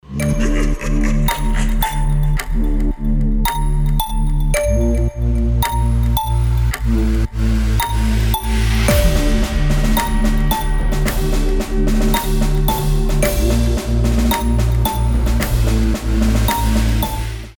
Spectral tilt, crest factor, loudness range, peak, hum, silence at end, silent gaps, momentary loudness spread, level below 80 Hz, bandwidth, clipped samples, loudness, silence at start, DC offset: -5.5 dB/octave; 14 dB; 2 LU; -2 dBFS; none; 0.05 s; none; 4 LU; -16 dBFS; 19.5 kHz; under 0.1%; -18 LUFS; 0.1 s; under 0.1%